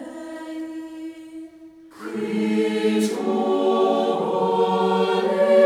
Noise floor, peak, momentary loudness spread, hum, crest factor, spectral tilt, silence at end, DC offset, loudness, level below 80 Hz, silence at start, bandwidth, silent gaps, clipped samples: -45 dBFS; -4 dBFS; 17 LU; none; 16 dB; -6 dB/octave; 0 s; under 0.1%; -21 LUFS; -70 dBFS; 0 s; 15 kHz; none; under 0.1%